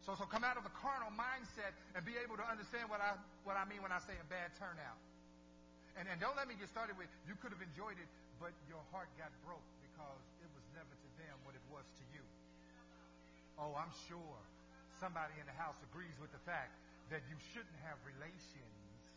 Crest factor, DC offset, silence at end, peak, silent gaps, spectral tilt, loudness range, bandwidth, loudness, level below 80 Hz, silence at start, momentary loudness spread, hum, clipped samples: 24 dB; under 0.1%; 0 s; -26 dBFS; none; -5 dB/octave; 13 LU; 7.8 kHz; -48 LUFS; -70 dBFS; 0 s; 19 LU; 60 Hz at -70 dBFS; under 0.1%